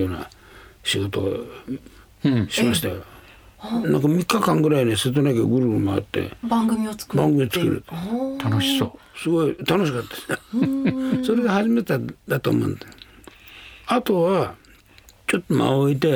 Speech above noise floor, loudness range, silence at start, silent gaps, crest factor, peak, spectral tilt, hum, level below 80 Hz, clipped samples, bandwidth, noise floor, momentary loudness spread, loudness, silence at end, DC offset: 30 dB; 4 LU; 0 s; none; 18 dB; -4 dBFS; -6 dB/octave; none; -54 dBFS; under 0.1%; over 20 kHz; -51 dBFS; 12 LU; -22 LUFS; 0 s; under 0.1%